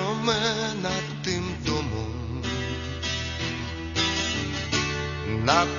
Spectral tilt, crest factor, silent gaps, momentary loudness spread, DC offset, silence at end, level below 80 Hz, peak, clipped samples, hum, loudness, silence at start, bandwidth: -4 dB/octave; 24 dB; none; 7 LU; under 0.1%; 0 s; -40 dBFS; -4 dBFS; under 0.1%; none; -27 LUFS; 0 s; 7.4 kHz